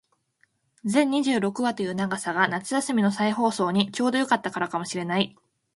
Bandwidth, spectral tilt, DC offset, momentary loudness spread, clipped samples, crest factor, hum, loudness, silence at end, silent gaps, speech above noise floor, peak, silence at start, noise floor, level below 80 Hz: 11.5 kHz; -4.5 dB/octave; under 0.1%; 6 LU; under 0.1%; 20 dB; none; -25 LUFS; 0.45 s; none; 44 dB; -4 dBFS; 0.85 s; -68 dBFS; -68 dBFS